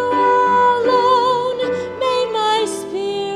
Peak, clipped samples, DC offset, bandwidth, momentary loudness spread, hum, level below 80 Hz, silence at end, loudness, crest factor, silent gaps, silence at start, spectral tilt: -4 dBFS; under 0.1%; under 0.1%; 13 kHz; 8 LU; none; -58 dBFS; 0 s; -16 LUFS; 12 dB; none; 0 s; -3.5 dB/octave